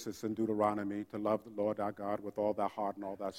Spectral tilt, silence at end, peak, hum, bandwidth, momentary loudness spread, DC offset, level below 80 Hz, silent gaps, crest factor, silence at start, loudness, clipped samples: -6.5 dB/octave; 0 s; -18 dBFS; none; 16 kHz; 7 LU; under 0.1%; -74 dBFS; none; 18 dB; 0 s; -36 LUFS; under 0.1%